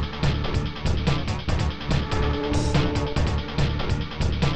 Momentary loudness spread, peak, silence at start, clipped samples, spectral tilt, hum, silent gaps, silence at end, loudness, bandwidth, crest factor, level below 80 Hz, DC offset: 4 LU; -10 dBFS; 0 s; under 0.1%; -6 dB/octave; none; none; 0 s; -25 LUFS; 9.6 kHz; 14 dB; -28 dBFS; 1%